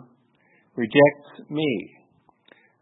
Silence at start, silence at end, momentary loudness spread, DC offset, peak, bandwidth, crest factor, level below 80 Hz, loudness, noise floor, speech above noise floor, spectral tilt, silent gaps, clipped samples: 0.75 s; 0.95 s; 24 LU; under 0.1%; -2 dBFS; 4 kHz; 22 dB; -72 dBFS; -22 LUFS; -62 dBFS; 41 dB; -10.5 dB/octave; none; under 0.1%